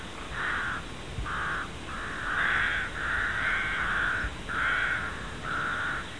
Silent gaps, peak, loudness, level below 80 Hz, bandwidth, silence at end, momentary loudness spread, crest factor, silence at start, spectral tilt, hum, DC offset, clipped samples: none; -14 dBFS; -30 LUFS; -44 dBFS; 10.5 kHz; 0 s; 10 LU; 16 dB; 0 s; -3.5 dB/octave; none; 0.5%; under 0.1%